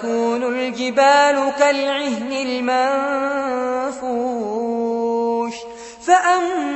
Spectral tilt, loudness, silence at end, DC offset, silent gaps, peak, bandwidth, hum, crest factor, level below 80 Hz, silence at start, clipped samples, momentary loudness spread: -3 dB/octave; -19 LUFS; 0 s; under 0.1%; none; -2 dBFS; 8.4 kHz; none; 16 dB; -60 dBFS; 0 s; under 0.1%; 9 LU